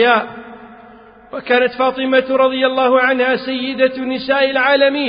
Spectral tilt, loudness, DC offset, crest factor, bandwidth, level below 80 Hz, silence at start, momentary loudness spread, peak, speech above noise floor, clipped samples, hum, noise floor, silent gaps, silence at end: -0.5 dB/octave; -15 LUFS; under 0.1%; 16 dB; 5.2 kHz; -56 dBFS; 0 s; 9 LU; 0 dBFS; 27 dB; under 0.1%; none; -41 dBFS; none; 0 s